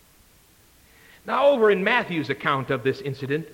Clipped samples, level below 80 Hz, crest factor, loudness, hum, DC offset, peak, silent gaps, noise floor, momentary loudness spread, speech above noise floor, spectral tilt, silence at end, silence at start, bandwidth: under 0.1%; -62 dBFS; 18 dB; -22 LUFS; none; under 0.1%; -6 dBFS; none; -56 dBFS; 10 LU; 34 dB; -6.5 dB/octave; 0.05 s; 1.25 s; 17 kHz